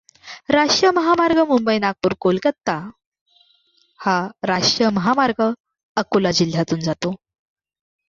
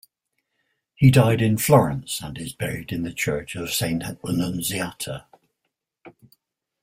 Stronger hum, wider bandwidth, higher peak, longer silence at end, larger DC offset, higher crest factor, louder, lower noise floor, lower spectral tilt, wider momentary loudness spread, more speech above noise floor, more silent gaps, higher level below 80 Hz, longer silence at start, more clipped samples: neither; second, 7.6 kHz vs 16 kHz; about the same, -2 dBFS vs -2 dBFS; first, 0.9 s vs 0.75 s; neither; about the same, 18 dB vs 20 dB; first, -19 LUFS vs -22 LUFS; second, -60 dBFS vs -79 dBFS; about the same, -4.5 dB/octave vs -5.5 dB/octave; about the same, 11 LU vs 13 LU; second, 42 dB vs 58 dB; first, 3.06-3.12 s, 3.21-3.26 s, 5.60-5.64 s, 5.83-5.95 s vs none; second, -56 dBFS vs -50 dBFS; second, 0.25 s vs 1 s; neither